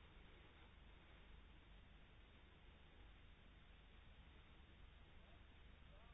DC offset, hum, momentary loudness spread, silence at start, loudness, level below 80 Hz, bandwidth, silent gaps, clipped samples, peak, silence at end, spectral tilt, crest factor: under 0.1%; 50 Hz at -75 dBFS; 1 LU; 0 s; -67 LUFS; -68 dBFS; 3.8 kHz; none; under 0.1%; -52 dBFS; 0 s; -4 dB/octave; 12 dB